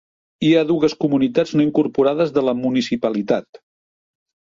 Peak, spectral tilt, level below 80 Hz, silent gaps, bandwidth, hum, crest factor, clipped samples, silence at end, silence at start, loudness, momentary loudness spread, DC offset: -4 dBFS; -6.5 dB/octave; -58 dBFS; none; 7.6 kHz; none; 16 dB; under 0.1%; 1.1 s; 0.4 s; -18 LUFS; 5 LU; under 0.1%